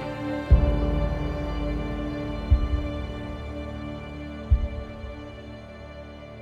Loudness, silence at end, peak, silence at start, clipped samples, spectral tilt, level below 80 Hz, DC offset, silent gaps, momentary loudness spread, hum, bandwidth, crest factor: -28 LUFS; 0 s; -6 dBFS; 0 s; under 0.1%; -8.5 dB/octave; -28 dBFS; under 0.1%; none; 18 LU; none; 6.8 kHz; 20 dB